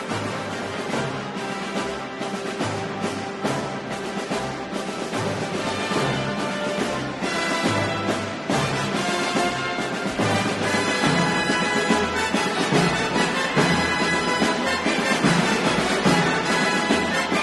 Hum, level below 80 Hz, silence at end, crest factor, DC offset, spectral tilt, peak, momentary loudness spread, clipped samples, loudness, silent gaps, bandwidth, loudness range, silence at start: none; -50 dBFS; 0 s; 18 dB; under 0.1%; -4 dB/octave; -6 dBFS; 9 LU; under 0.1%; -23 LUFS; none; 12 kHz; 7 LU; 0 s